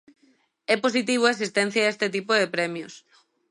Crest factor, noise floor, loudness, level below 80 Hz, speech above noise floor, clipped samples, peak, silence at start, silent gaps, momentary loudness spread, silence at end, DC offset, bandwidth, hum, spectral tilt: 20 dB; -64 dBFS; -23 LUFS; -78 dBFS; 40 dB; under 0.1%; -6 dBFS; 0.7 s; none; 11 LU; 0.5 s; under 0.1%; 11.5 kHz; none; -3.5 dB/octave